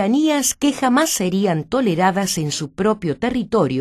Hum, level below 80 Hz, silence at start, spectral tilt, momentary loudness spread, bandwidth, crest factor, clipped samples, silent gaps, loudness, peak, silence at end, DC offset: none; -50 dBFS; 0 s; -4.5 dB/octave; 5 LU; 13.5 kHz; 14 dB; under 0.1%; none; -18 LUFS; -4 dBFS; 0 s; under 0.1%